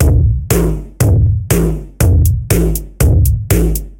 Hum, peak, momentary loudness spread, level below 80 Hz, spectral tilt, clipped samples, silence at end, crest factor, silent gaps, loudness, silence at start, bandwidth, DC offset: none; 0 dBFS; 4 LU; -16 dBFS; -6.5 dB/octave; under 0.1%; 0.05 s; 12 dB; none; -13 LUFS; 0 s; 17.5 kHz; under 0.1%